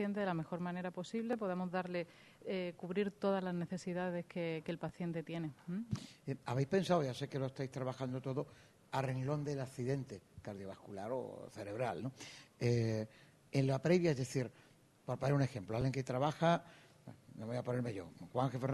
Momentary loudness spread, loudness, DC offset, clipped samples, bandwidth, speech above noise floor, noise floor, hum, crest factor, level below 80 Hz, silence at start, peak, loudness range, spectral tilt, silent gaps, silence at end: 14 LU; -39 LUFS; under 0.1%; under 0.1%; 12 kHz; 19 dB; -58 dBFS; none; 20 dB; -70 dBFS; 0 s; -18 dBFS; 5 LU; -7 dB/octave; none; 0 s